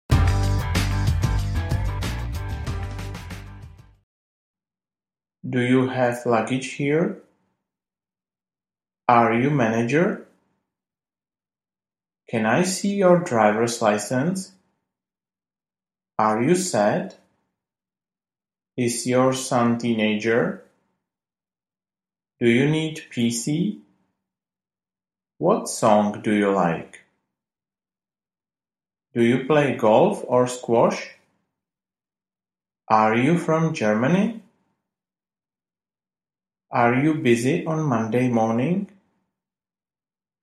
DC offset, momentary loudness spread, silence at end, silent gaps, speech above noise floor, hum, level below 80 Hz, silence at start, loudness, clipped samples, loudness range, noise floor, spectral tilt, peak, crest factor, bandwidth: under 0.1%; 12 LU; 1.55 s; 4.03-4.54 s; over 70 dB; none; -38 dBFS; 0.1 s; -21 LUFS; under 0.1%; 5 LU; under -90 dBFS; -6 dB/octave; 0 dBFS; 22 dB; 15.5 kHz